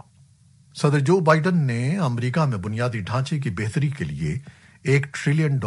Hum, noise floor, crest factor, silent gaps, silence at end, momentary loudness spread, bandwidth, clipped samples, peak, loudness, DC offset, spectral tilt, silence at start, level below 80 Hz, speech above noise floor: none; -54 dBFS; 20 dB; none; 0 s; 9 LU; 11.5 kHz; under 0.1%; -4 dBFS; -22 LUFS; under 0.1%; -7 dB/octave; 0.75 s; -52 dBFS; 33 dB